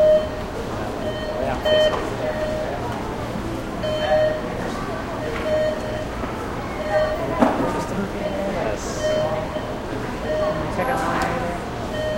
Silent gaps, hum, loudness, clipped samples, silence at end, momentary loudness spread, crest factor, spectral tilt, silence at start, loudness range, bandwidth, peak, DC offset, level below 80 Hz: none; none; -24 LUFS; under 0.1%; 0 s; 8 LU; 22 dB; -5.5 dB/octave; 0 s; 2 LU; 16.5 kHz; -2 dBFS; under 0.1%; -38 dBFS